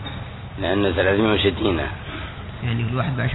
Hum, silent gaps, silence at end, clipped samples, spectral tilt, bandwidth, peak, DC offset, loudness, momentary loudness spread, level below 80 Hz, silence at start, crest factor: none; none; 0 s; under 0.1%; -9.5 dB/octave; 4.1 kHz; -6 dBFS; under 0.1%; -22 LUFS; 14 LU; -38 dBFS; 0 s; 16 dB